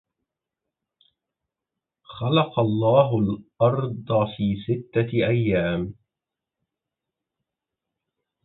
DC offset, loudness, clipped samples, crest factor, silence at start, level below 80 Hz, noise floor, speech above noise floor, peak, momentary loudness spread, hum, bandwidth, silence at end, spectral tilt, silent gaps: under 0.1%; -23 LUFS; under 0.1%; 20 dB; 2.1 s; -52 dBFS; -87 dBFS; 65 dB; -4 dBFS; 9 LU; none; 4.1 kHz; 2.55 s; -11.5 dB/octave; none